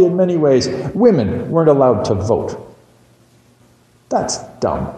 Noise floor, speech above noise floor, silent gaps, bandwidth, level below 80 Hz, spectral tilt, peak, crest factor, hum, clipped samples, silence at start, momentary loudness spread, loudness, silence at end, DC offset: -51 dBFS; 36 dB; none; 10 kHz; -44 dBFS; -6.5 dB/octave; 0 dBFS; 16 dB; none; under 0.1%; 0 s; 9 LU; -15 LUFS; 0 s; under 0.1%